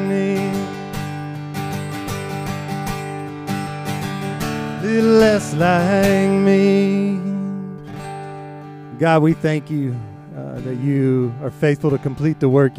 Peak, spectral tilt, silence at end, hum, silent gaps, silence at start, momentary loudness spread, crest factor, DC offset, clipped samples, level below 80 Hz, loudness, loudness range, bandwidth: -2 dBFS; -7 dB/octave; 0 s; none; none; 0 s; 16 LU; 16 dB; under 0.1%; under 0.1%; -48 dBFS; -19 LUFS; 10 LU; 16 kHz